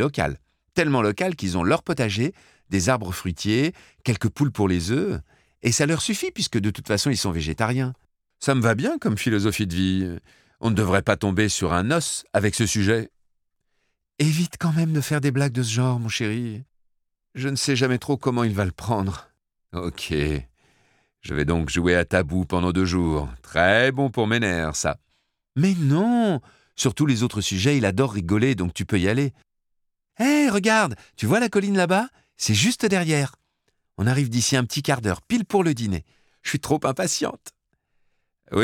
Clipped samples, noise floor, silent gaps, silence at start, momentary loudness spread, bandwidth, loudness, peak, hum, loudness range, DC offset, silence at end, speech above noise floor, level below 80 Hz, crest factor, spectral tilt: under 0.1%; -74 dBFS; none; 0 s; 9 LU; 17.5 kHz; -23 LUFS; -4 dBFS; none; 4 LU; under 0.1%; 0 s; 52 dB; -44 dBFS; 20 dB; -5 dB/octave